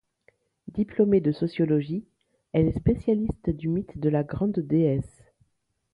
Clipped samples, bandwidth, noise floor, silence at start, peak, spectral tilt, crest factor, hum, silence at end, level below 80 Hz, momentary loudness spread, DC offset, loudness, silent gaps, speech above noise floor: under 0.1%; 10.5 kHz; -74 dBFS; 0.65 s; -10 dBFS; -10 dB/octave; 16 dB; none; 0.85 s; -44 dBFS; 9 LU; under 0.1%; -26 LUFS; none; 50 dB